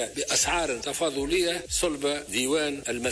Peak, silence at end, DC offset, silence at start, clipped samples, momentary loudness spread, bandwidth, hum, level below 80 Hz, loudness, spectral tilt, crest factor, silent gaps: -14 dBFS; 0 s; under 0.1%; 0 s; under 0.1%; 6 LU; 11 kHz; none; -48 dBFS; -26 LUFS; -2 dB/octave; 14 dB; none